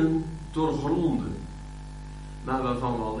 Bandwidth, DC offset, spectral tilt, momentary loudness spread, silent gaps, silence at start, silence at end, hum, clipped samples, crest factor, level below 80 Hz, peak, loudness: 10.5 kHz; under 0.1%; -7.5 dB/octave; 16 LU; none; 0 s; 0 s; 50 Hz at -40 dBFS; under 0.1%; 16 dB; -40 dBFS; -12 dBFS; -29 LUFS